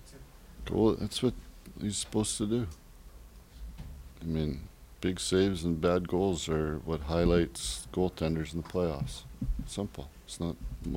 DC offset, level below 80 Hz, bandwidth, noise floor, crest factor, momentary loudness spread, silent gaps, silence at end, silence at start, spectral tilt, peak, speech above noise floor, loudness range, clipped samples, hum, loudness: under 0.1%; -44 dBFS; 16 kHz; -51 dBFS; 20 dB; 19 LU; none; 0 s; 0 s; -5.5 dB/octave; -12 dBFS; 20 dB; 5 LU; under 0.1%; none; -32 LUFS